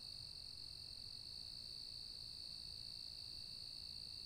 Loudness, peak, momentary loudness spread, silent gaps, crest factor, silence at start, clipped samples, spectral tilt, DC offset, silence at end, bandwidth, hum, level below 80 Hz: -49 LUFS; -40 dBFS; 1 LU; none; 12 dB; 0 s; under 0.1%; -1.5 dB/octave; under 0.1%; 0 s; 16 kHz; none; -68 dBFS